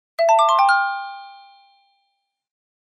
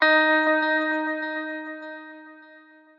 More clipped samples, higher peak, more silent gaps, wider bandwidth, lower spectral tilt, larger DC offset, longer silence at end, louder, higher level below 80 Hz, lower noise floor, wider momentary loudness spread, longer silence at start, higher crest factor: neither; about the same, -6 dBFS vs -6 dBFS; neither; first, 15 kHz vs 6.6 kHz; second, 3 dB/octave vs -3 dB/octave; neither; first, 1.55 s vs 0.6 s; first, -16 LUFS vs -22 LUFS; about the same, under -90 dBFS vs under -90 dBFS; first, -73 dBFS vs -51 dBFS; about the same, 19 LU vs 20 LU; first, 0.2 s vs 0 s; about the same, 16 dB vs 18 dB